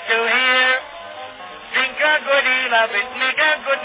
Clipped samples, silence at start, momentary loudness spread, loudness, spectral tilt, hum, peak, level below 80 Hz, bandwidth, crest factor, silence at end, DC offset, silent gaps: under 0.1%; 0 s; 19 LU; -16 LUFS; -4 dB/octave; none; -4 dBFS; -64 dBFS; 4 kHz; 14 dB; 0 s; under 0.1%; none